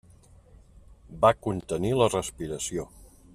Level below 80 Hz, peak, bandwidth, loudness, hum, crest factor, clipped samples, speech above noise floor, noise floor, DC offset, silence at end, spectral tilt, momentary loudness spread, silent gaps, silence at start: -50 dBFS; -6 dBFS; 14.5 kHz; -27 LUFS; none; 22 dB; under 0.1%; 28 dB; -54 dBFS; under 0.1%; 0.35 s; -5 dB/octave; 11 LU; none; 0.9 s